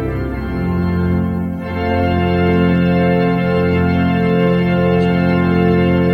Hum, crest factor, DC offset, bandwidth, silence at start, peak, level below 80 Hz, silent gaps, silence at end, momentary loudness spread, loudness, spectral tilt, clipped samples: none; 12 dB; under 0.1%; 5.6 kHz; 0 s; -2 dBFS; -32 dBFS; none; 0 s; 7 LU; -15 LUFS; -9.5 dB/octave; under 0.1%